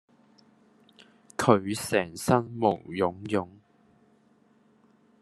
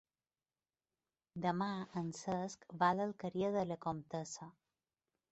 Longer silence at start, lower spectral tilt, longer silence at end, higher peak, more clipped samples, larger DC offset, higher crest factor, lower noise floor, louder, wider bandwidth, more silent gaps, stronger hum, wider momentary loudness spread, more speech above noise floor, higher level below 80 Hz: about the same, 1.4 s vs 1.35 s; about the same, -5.5 dB/octave vs -5.5 dB/octave; first, 1.7 s vs 0.8 s; first, -4 dBFS vs -18 dBFS; neither; neither; about the same, 26 dB vs 22 dB; second, -63 dBFS vs under -90 dBFS; first, -27 LUFS vs -40 LUFS; first, 12.5 kHz vs 8 kHz; neither; neither; second, 8 LU vs 13 LU; second, 37 dB vs over 51 dB; first, -66 dBFS vs -76 dBFS